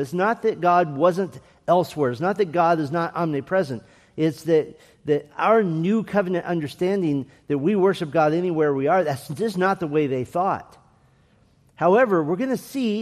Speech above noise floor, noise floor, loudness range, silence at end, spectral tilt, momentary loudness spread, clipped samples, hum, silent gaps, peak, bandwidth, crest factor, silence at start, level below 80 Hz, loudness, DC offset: 37 dB; -58 dBFS; 2 LU; 0 s; -7 dB/octave; 8 LU; under 0.1%; none; none; -6 dBFS; 14.5 kHz; 16 dB; 0 s; -64 dBFS; -22 LUFS; under 0.1%